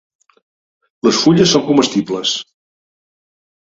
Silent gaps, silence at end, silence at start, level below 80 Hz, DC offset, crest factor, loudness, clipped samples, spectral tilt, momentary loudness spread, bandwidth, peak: none; 1.25 s; 1.05 s; -54 dBFS; under 0.1%; 18 dB; -14 LUFS; under 0.1%; -4.5 dB/octave; 8 LU; 8 kHz; 0 dBFS